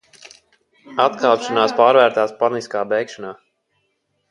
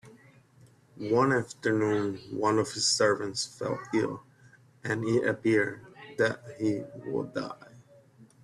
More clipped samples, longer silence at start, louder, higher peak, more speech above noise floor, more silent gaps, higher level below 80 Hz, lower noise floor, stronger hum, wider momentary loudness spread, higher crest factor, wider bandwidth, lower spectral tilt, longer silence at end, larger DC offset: neither; first, 0.9 s vs 0.05 s; first, -17 LUFS vs -29 LUFS; first, 0 dBFS vs -12 dBFS; first, 53 dB vs 30 dB; neither; about the same, -70 dBFS vs -68 dBFS; first, -69 dBFS vs -59 dBFS; neither; about the same, 16 LU vs 14 LU; about the same, 20 dB vs 18 dB; second, 11 kHz vs 12.5 kHz; about the same, -4 dB/octave vs -4 dB/octave; first, 1 s vs 0.2 s; neither